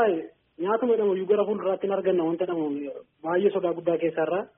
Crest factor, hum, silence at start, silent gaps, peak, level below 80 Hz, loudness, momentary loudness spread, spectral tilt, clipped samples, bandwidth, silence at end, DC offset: 16 dB; none; 0 s; none; -10 dBFS; -72 dBFS; -26 LUFS; 9 LU; -3.5 dB/octave; under 0.1%; 3.7 kHz; 0.1 s; under 0.1%